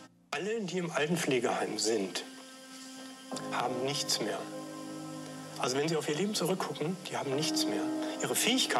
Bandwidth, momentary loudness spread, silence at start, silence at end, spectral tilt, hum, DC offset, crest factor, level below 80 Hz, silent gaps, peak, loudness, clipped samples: 16 kHz; 13 LU; 0 s; 0 s; -3.5 dB/octave; none; under 0.1%; 18 dB; -86 dBFS; none; -16 dBFS; -33 LUFS; under 0.1%